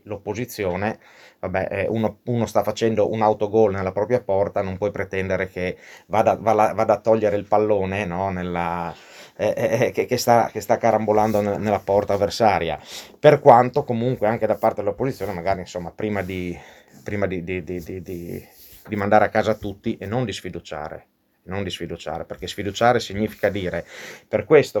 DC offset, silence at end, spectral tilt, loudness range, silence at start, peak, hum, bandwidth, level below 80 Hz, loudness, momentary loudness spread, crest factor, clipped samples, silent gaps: under 0.1%; 0 s; -6 dB/octave; 8 LU; 0.05 s; 0 dBFS; none; 19 kHz; -52 dBFS; -21 LUFS; 15 LU; 22 dB; under 0.1%; none